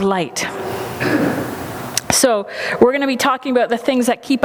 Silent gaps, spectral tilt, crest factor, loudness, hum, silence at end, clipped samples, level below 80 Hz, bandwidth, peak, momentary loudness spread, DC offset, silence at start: none; -3.5 dB/octave; 18 dB; -17 LUFS; none; 0 s; under 0.1%; -50 dBFS; over 20 kHz; 0 dBFS; 9 LU; under 0.1%; 0 s